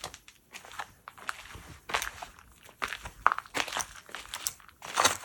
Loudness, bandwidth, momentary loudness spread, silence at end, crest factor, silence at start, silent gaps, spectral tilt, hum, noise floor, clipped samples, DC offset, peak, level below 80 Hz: -33 LUFS; 19 kHz; 19 LU; 0 s; 34 dB; 0 s; none; -0.5 dB/octave; none; -55 dBFS; under 0.1%; under 0.1%; -2 dBFS; -58 dBFS